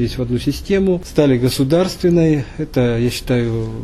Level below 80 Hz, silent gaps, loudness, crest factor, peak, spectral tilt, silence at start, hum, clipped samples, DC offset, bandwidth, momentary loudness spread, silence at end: -34 dBFS; none; -17 LUFS; 14 dB; -2 dBFS; -6.5 dB/octave; 0 s; none; under 0.1%; under 0.1%; 13.5 kHz; 6 LU; 0 s